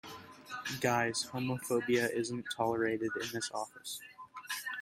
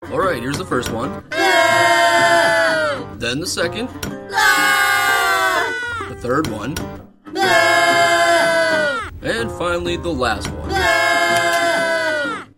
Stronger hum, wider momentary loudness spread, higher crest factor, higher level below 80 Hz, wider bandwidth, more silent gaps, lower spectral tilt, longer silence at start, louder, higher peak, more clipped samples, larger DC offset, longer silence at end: neither; first, 14 LU vs 11 LU; about the same, 20 dB vs 16 dB; second, -72 dBFS vs -42 dBFS; about the same, 16 kHz vs 16.5 kHz; neither; about the same, -4 dB/octave vs -3 dB/octave; about the same, 0.05 s vs 0 s; second, -35 LUFS vs -16 LUFS; second, -16 dBFS vs -2 dBFS; neither; neither; second, 0 s vs 0.15 s